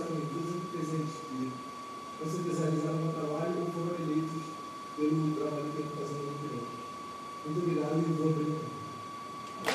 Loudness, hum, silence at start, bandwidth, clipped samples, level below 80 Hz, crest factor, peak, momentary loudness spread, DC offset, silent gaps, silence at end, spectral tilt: -35 LUFS; none; 0 s; 13 kHz; under 0.1%; -76 dBFS; 20 dB; -14 dBFS; 11 LU; under 0.1%; none; 0 s; -6.5 dB/octave